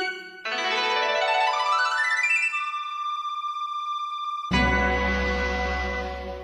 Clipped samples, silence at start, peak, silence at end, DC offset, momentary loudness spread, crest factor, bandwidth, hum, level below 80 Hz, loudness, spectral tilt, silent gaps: under 0.1%; 0 s; -10 dBFS; 0 s; under 0.1%; 9 LU; 16 dB; 11.5 kHz; none; -36 dBFS; -24 LUFS; -4 dB/octave; none